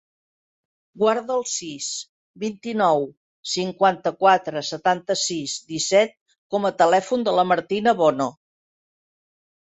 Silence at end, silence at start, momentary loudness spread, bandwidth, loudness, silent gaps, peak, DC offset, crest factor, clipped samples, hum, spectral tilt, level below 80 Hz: 1.3 s; 0.95 s; 11 LU; 8.4 kHz; -22 LUFS; 2.09-2.34 s, 3.17-3.43 s, 6.21-6.26 s, 6.38-6.50 s; -4 dBFS; under 0.1%; 20 dB; under 0.1%; none; -3.5 dB/octave; -68 dBFS